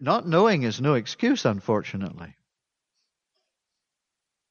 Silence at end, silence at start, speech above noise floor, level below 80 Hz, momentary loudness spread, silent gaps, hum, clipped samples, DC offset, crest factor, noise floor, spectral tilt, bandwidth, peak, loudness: 2.2 s; 0 s; 61 dB; -66 dBFS; 14 LU; none; none; under 0.1%; under 0.1%; 20 dB; -85 dBFS; -6 dB/octave; 7.2 kHz; -6 dBFS; -24 LUFS